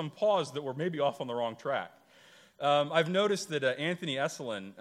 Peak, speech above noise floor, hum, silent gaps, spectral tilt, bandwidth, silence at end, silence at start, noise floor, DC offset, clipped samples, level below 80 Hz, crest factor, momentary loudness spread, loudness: -12 dBFS; 28 dB; none; none; -4.5 dB/octave; 14.5 kHz; 0 s; 0 s; -59 dBFS; under 0.1%; under 0.1%; -82 dBFS; 20 dB; 9 LU; -31 LUFS